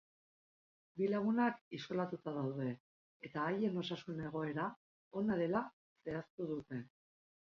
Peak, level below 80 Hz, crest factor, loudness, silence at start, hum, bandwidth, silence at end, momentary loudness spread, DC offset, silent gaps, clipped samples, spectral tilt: -22 dBFS; -76 dBFS; 18 dB; -40 LUFS; 0.95 s; none; 7 kHz; 0.7 s; 13 LU; under 0.1%; 1.61-1.71 s, 2.80-3.20 s, 4.76-5.11 s, 5.73-5.96 s, 6.30-6.38 s; under 0.1%; -5.5 dB/octave